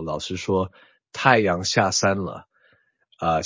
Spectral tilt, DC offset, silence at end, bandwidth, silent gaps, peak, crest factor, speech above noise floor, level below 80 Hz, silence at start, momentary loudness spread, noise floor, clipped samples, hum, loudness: -4 dB/octave; under 0.1%; 0 s; 7.8 kHz; none; 0 dBFS; 24 dB; 40 dB; -48 dBFS; 0 s; 15 LU; -62 dBFS; under 0.1%; none; -22 LUFS